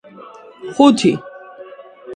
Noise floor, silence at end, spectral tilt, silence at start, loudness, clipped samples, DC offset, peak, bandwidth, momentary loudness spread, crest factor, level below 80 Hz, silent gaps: -39 dBFS; 0 s; -5.5 dB/octave; 0.6 s; -14 LUFS; under 0.1%; under 0.1%; 0 dBFS; 9.8 kHz; 26 LU; 18 dB; -60 dBFS; none